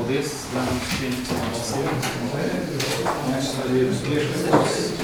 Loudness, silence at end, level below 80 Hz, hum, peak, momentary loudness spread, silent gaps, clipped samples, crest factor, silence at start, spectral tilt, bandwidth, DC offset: -24 LUFS; 0 s; -46 dBFS; none; -2 dBFS; 6 LU; none; under 0.1%; 20 dB; 0 s; -4.5 dB/octave; over 20 kHz; under 0.1%